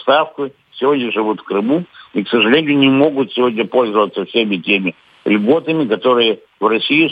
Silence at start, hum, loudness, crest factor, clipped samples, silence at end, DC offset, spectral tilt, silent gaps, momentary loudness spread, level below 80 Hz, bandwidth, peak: 0 s; none; -15 LUFS; 14 dB; under 0.1%; 0 s; under 0.1%; -7.5 dB/octave; none; 8 LU; -68 dBFS; 5 kHz; 0 dBFS